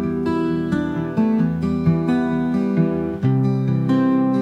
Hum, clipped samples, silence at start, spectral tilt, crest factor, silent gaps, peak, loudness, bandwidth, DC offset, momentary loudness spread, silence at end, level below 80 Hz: none; under 0.1%; 0 s; -9.5 dB/octave; 12 dB; none; -6 dBFS; -20 LUFS; 7.8 kHz; under 0.1%; 4 LU; 0 s; -50 dBFS